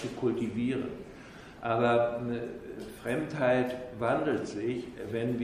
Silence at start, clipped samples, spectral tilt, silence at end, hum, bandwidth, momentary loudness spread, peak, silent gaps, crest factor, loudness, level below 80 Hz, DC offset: 0 s; under 0.1%; -7 dB/octave; 0 s; none; 15 kHz; 15 LU; -12 dBFS; none; 18 dB; -31 LUFS; -60 dBFS; under 0.1%